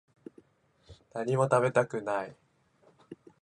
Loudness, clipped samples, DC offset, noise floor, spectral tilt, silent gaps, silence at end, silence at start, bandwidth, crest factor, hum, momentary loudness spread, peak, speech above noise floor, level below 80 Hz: -29 LUFS; under 0.1%; under 0.1%; -66 dBFS; -6.5 dB/octave; none; 0.3 s; 0.9 s; 11 kHz; 22 dB; none; 22 LU; -10 dBFS; 38 dB; -70 dBFS